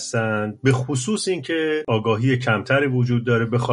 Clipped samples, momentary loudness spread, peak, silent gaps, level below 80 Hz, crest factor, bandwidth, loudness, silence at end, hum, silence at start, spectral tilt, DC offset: under 0.1%; 4 LU; -4 dBFS; none; -56 dBFS; 16 dB; 11 kHz; -21 LUFS; 0 s; none; 0 s; -5.5 dB/octave; under 0.1%